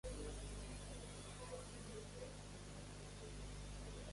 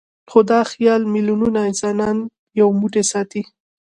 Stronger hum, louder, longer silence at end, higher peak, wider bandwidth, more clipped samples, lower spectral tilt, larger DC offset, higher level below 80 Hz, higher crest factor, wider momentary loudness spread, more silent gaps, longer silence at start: first, 50 Hz at -55 dBFS vs none; second, -53 LUFS vs -17 LUFS; second, 0 s vs 0.45 s; second, -38 dBFS vs 0 dBFS; about the same, 11.5 kHz vs 11.5 kHz; neither; about the same, -4.5 dB/octave vs -5 dB/octave; neither; about the same, -56 dBFS vs -56 dBFS; about the same, 14 dB vs 18 dB; second, 4 LU vs 10 LU; second, none vs 2.39-2.47 s; second, 0.05 s vs 0.3 s